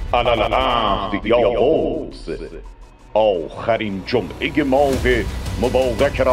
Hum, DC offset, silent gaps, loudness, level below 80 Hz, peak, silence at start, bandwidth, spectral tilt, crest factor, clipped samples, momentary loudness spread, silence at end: none; under 0.1%; none; -18 LUFS; -32 dBFS; -2 dBFS; 0 s; 16 kHz; -6 dB/octave; 16 dB; under 0.1%; 12 LU; 0 s